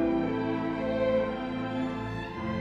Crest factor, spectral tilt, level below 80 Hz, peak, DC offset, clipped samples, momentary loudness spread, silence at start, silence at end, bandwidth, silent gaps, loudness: 14 dB; -8 dB/octave; -50 dBFS; -16 dBFS; under 0.1%; under 0.1%; 7 LU; 0 s; 0 s; 7.8 kHz; none; -30 LUFS